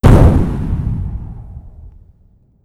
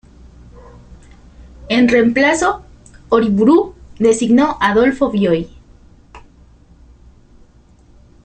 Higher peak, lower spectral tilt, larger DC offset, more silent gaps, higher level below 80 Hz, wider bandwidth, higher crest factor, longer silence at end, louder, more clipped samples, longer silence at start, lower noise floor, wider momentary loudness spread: about the same, 0 dBFS vs -2 dBFS; first, -8.5 dB/octave vs -5 dB/octave; neither; neither; first, -18 dBFS vs -42 dBFS; first, 13 kHz vs 9.2 kHz; about the same, 14 dB vs 16 dB; second, 0.75 s vs 2.05 s; about the same, -14 LUFS vs -14 LUFS; first, 1% vs under 0.1%; second, 0.05 s vs 0.55 s; about the same, -50 dBFS vs -47 dBFS; first, 25 LU vs 7 LU